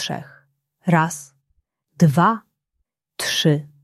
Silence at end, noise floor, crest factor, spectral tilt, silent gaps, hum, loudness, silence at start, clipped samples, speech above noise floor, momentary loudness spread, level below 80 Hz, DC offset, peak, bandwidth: 0.2 s; -76 dBFS; 20 dB; -5 dB/octave; none; none; -20 LUFS; 0 s; under 0.1%; 57 dB; 16 LU; -62 dBFS; under 0.1%; -2 dBFS; 14 kHz